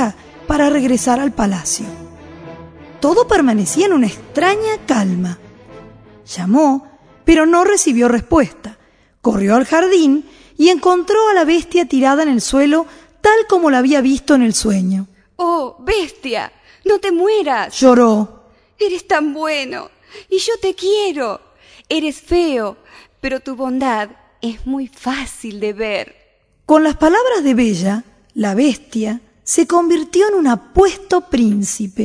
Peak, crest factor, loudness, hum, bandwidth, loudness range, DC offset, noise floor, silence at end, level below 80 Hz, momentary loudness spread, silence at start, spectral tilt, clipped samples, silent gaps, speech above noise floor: 0 dBFS; 16 dB; -15 LUFS; none; 11 kHz; 6 LU; under 0.1%; -55 dBFS; 0 s; -38 dBFS; 12 LU; 0 s; -4.5 dB/octave; under 0.1%; none; 41 dB